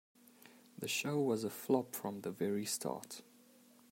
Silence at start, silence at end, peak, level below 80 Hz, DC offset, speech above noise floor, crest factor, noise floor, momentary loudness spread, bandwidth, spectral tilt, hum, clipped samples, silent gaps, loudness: 0.45 s; 0.7 s; -20 dBFS; -86 dBFS; under 0.1%; 26 dB; 20 dB; -64 dBFS; 12 LU; 16 kHz; -4 dB/octave; none; under 0.1%; none; -38 LUFS